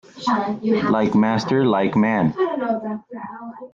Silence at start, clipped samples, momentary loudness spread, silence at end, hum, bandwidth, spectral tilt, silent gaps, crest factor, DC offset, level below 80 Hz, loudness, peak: 0.15 s; under 0.1%; 15 LU; 0.05 s; none; 7.4 kHz; -7 dB/octave; none; 14 dB; under 0.1%; -58 dBFS; -20 LUFS; -6 dBFS